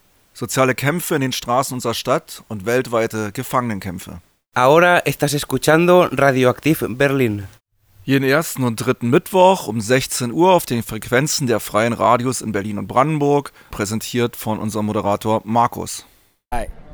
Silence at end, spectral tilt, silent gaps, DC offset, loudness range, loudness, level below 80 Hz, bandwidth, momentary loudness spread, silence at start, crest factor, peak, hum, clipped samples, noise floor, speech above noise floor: 0 s; -5 dB/octave; none; under 0.1%; 5 LU; -18 LUFS; -44 dBFS; over 20 kHz; 14 LU; 0.35 s; 16 dB; -2 dBFS; none; under 0.1%; -51 dBFS; 33 dB